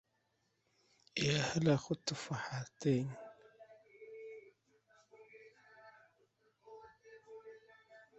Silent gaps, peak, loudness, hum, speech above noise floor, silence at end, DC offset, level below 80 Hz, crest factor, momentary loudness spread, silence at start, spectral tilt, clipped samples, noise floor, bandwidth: none; -18 dBFS; -37 LUFS; none; 45 dB; 0.15 s; under 0.1%; -74 dBFS; 24 dB; 27 LU; 1.15 s; -5 dB/octave; under 0.1%; -81 dBFS; 8 kHz